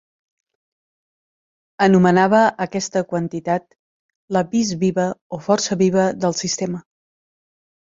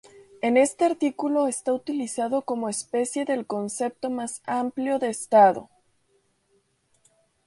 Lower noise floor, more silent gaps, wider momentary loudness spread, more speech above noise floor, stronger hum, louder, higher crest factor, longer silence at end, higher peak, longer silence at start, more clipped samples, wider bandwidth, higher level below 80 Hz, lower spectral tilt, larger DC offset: first, under -90 dBFS vs -68 dBFS; first, 3.79-4.09 s, 4.15-4.28 s, 5.21-5.30 s vs none; about the same, 10 LU vs 10 LU; first, over 72 dB vs 44 dB; neither; first, -19 LUFS vs -25 LUFS; about the same, 18 dB vs 20 dB; second, 1.1 s vs 1.8 s; first, -2 dBFS vs -6 dBFS; first, 1.8 s vs 0.45 s; neither; second, 7.8 kHz vs 11.5 kHz; first, -60 dBFS vs -72 dBFS; about the same, -5 dB/octave vs -4 dB/octave; neither